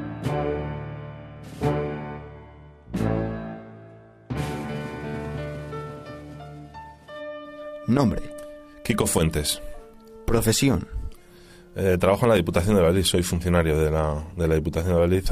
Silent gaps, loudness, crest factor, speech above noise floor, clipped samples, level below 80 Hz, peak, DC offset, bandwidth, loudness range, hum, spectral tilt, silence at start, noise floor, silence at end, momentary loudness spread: none; -24 LUFS; 20 dB; 27 dB; under 0.1%; -38 dBFS; -6 dBFS; under 0.1%; 15.5 kHz; 12 LU; none; -5.5 dB/octave; 0 s; -48 dBFS; 0 s; 21 LU